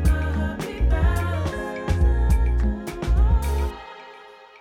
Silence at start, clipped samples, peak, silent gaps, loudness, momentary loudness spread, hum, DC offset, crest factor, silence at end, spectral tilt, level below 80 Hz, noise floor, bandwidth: 0 s; under 0.1%; -8 dBFS; none; -24 LUFS; 17 LU; none; under 0.1%; 12 dB; 0.3 s; -7 dB/octave; -22 dBFS; -45 dBFS; 14 kHz